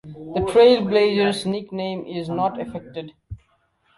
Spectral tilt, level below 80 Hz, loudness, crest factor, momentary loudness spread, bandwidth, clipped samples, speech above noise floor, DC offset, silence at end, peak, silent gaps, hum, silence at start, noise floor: -6 dB/octave; -50 dBFS; -20 LUFS; 18 dB; 19 LU; 11.5 kHz; under 0.1%; 44 dB; under 0.1%; 0.6 s; -4 dBFS; none; none; 0.05 s; -64 dBFS